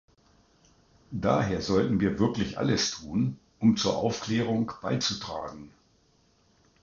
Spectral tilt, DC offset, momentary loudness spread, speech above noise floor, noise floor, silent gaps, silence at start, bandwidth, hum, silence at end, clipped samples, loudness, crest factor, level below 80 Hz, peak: -5 dB/octave; under 0.1%; 10 LU; 38 dB; -65 dBFS; none; 1.1 s; 7.6 kHz; none; 1.15 s; under 0.1%; -28 LUFS; 20 dB; -52 dBFS; -10 dBFS